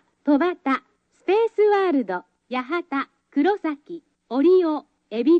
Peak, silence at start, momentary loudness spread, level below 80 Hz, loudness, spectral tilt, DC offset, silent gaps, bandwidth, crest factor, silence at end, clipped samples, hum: -8 dBFS; 0.25 s; 14 LU; -70 dBFS; -22 LUFS; -6.5 dB/octave; under 0.1%; none; 5.8 kHz; 14 dB; 0 s; under 0.1%; none